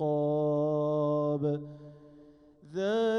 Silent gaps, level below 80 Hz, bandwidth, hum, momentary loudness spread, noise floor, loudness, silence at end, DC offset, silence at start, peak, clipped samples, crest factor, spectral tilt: none; -68 dBFS; 7 kHz; none; 12 LU; -56 dBFS; -30 LUFS; 0 s; under 0.1%; 0 s; -20 dBFS; under 0.1%; 10 dB; -8 dB/octave